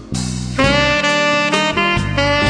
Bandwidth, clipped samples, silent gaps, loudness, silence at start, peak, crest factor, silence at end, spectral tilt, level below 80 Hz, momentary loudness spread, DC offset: 10.5 kHz; under 0.1%; none; -15 LUFS; 0 s; 0 dBFS; 14 dB; 0 s; -4 dB/octave; -32 dBFS; 8 LU; under 0.1%